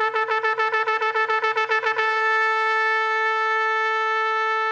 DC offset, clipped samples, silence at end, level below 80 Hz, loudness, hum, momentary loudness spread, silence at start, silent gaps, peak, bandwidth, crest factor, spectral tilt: under 0.1%; under 0.1%; 0 s; -76 dBFS; -20 LUFS; none; 2 LU; 0 s; none; -6 dBFS; 8.4 kHz; 16 dB; 0 dB/octave